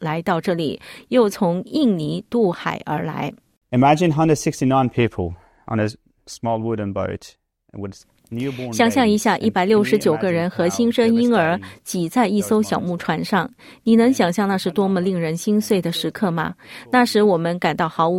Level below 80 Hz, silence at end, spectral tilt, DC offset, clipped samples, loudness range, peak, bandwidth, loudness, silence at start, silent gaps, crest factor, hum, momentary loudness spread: -56 dBFS; 0 s; -6 dB/octave; under 0.1%; under 0.1%; 5 LU; -2 dBFS; 16.5 kHz; -20 LUFS; 0 s; 3.57-3.61 s; 18 dB; none; 12 LU